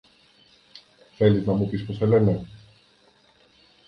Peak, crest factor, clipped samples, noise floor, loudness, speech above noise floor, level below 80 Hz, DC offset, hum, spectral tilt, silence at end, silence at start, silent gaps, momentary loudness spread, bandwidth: -6 dBFS; 20 dB; under 0.1%; -59 dBFS; -22 LUFS; 38 dB; -52 dBFS; under 0.1%; none; -9.5 dB/octave; 1.3 s; 1.2 s; none; 9 LU; 6 kHz